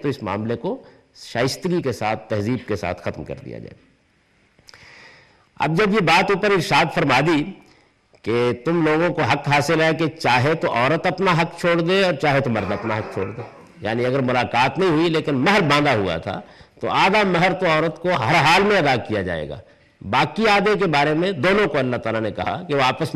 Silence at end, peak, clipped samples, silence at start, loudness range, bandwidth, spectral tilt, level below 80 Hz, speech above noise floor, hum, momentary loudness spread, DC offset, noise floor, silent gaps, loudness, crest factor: 0 s; -4 dBFS; under 0.1%; 0 s; 7 LU; 14 kHz; -5.5 dB/octave; -52 dBFS; 41 dB; none; 13 LU; under 0.1%; -60 dBFS; none; -19 LUFS; 16 dB